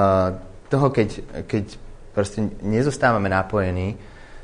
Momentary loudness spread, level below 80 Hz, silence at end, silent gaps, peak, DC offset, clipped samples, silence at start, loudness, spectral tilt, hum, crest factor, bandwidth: 12 LU; -42 dBFS; 0 s; none; -4 dBFS; under 0.1%; under 0.1%; 0 s; -22 LUFS; -7 dB/octave; none; 18 dB; 10 kHz